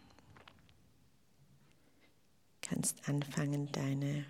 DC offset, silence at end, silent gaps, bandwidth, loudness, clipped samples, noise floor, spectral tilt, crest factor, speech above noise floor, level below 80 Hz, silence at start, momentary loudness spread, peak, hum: under 0.1%; 0 s; none; 16 kHz; -38 LUFS; under 0.1%; -73 dBFS; -5 dB/octave; 22 dB; 36 dB; -76 dBFS; 0.3 s; 23 LU; -20 dBFS; none